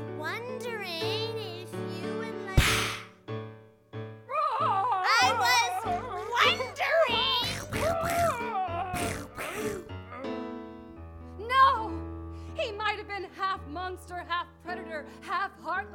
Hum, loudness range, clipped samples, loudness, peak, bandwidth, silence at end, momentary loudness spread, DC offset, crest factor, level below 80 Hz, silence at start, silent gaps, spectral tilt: none; 8 LU; under 0.1%; -29 LUFS; -8 dBFS; 19 kHz; 0 s; 17 LU; under 0.1%; 22 dB; -46 dBFS; 0 s; none; -3.5 dB/octave